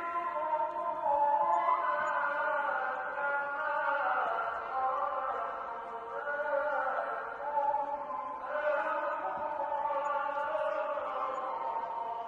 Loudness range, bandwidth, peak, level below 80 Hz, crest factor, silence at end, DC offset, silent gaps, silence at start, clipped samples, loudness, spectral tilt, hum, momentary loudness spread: 3 LU; 7.4 kHz; -18 dBFS; -72 dBFS; 16 dB; 0 s; under 0.1%; none; 0 s; under 0.1%; -33 LUFS; -4 dB/octave; none; 7 LU